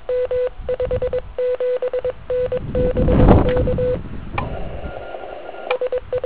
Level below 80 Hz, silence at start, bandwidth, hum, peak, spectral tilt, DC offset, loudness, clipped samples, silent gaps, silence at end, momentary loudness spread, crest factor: -26 dBFS; 0.05 s; 4 kHz; none; 0 dBFS; -12 dB/octave; 1%; -20 LUFS; under 0.1%; none; 0 s; 17 LU; 20 dB